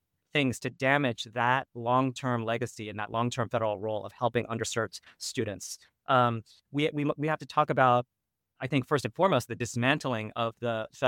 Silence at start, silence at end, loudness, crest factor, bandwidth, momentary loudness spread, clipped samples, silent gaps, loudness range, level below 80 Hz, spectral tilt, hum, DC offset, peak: 0.35 s; 0 s; -29 LUFS; 22 dB; 17.5 kHz; 11 LU; under 0.1%; none; 4 LU; -70 dBFS; -5 dB/octave; none; under 0.1%; -8 dBFS